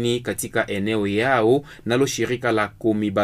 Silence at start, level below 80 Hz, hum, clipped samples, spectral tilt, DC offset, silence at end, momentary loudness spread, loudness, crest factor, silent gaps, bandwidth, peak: 0 s; -52 dBFS; none; under 0.1%; -5 dB/octave; under 0.1%; 0 s; 6 LU; -22 LUFS; 16 dB; none; 15.5 kHz; -6 dBFS